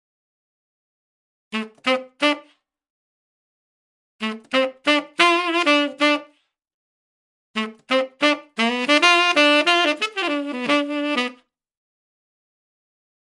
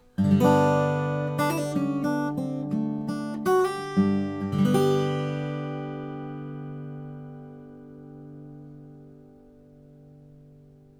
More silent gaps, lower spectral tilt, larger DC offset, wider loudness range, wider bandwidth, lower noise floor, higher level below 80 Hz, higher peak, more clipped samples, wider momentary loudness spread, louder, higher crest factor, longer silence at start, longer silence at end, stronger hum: first, 2.90-4.19 s, 6.74-7.54 s vs none; second, -2 dB/octave vs -7 dB/octave; neither; second, 10 LU vs 20 LU; second, 11.5 kHz vs 17.5 kHz; first, -59 dBFS vs -52 dBFS; second, -80 dBFS vs -62 dBFS; first, -2 dBFS vs -8 dBFS; neither; second, 14 LU vs 23 LU; first, -19 LUFS vs -26 LUFS; about the same, 22 dB vs 20 dB; first, 1.5 s vs 0.2 s; first, 2.05 s vs 0.75 s; neither